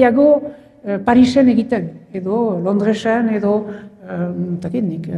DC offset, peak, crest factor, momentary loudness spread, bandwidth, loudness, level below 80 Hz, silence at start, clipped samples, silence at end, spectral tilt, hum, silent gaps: under 0.1%; 0 dBFS; 16 dB; 16 LU; 9.6 kHz; -16 LUFS; -52 dBFS; 0 s; under 0.1%; 0 s; -7.5 dB/octave; none; none